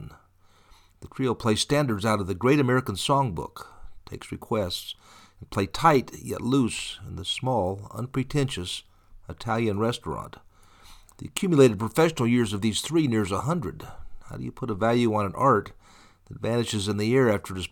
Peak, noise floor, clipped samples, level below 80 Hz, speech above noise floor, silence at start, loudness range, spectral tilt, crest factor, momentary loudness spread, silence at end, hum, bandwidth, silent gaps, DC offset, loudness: -6 dBFS; -58 dBFS; under 0.1%; -50 dBFS; 33 dB; 0 s; 5 LU; -5.5 dB/octave; 22 dB; 18 LU; 0.05 s; none; 19 kHz; none; under 0.1%; -25 LUFS